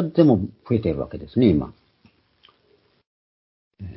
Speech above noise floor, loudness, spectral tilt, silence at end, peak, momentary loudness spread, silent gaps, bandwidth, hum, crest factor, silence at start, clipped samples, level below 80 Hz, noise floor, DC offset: 42 dB; -21 LUFS; -13 dB/octave; 0 s; -4 dBFS; 14 LU; 3.07-3.71 s; 5.8 kHz; none; 20 dB; 0 s; under 0.1%; -44 dBFS; -62 dBFS; under 0.1%